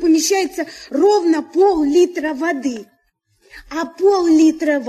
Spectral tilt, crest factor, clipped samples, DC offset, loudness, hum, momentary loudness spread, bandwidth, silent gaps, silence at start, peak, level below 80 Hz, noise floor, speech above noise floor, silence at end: -2.5 dB/octave; 12 dB; under 0.1%; under 0.1%; -16 LUFS; none; 13 LU; 13.5 kHz; none; 0 s; -4 dBFS; -52 dBFS; -63 dBFS; 48 dB; 0 s